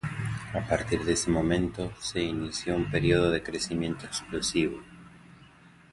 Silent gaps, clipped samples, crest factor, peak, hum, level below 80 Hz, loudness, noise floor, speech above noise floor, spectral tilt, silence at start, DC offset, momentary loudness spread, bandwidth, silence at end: none; under 0.1%; 20 dB; -8 dBFS; none; -46 dBFS; -29 LUFS; -55 dBFS; 26 dB; -5 dB/octave; 0.05 s; under 0.1%; 9 LU; 11.5 kHz; 0.25 s